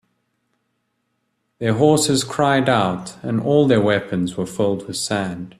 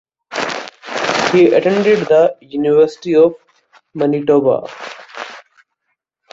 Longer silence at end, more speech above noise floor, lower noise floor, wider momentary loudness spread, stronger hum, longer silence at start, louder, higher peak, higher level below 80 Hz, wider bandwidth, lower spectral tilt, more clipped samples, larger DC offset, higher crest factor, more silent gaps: second, 0.1 s vs 0.95 s; second, 53 dB vs 59 dB; about the same, -71 dBFS vs -72 dBFS; second, 9 LU vs 18 LU; neither; first, 1.6 s vs 0.3 s; second, -19 LUFS vs -14 LUFS; about the same, -2 dBFS vs 0 dBFS; about the same, -56 dBFS vs -58 dBFS; first, 14 kHz vs 7.8 kHz; about the same, -5 dB/octave vs -5.5 dB/octave; neither; neither; about the same, 18 dB vs 16 dB; neither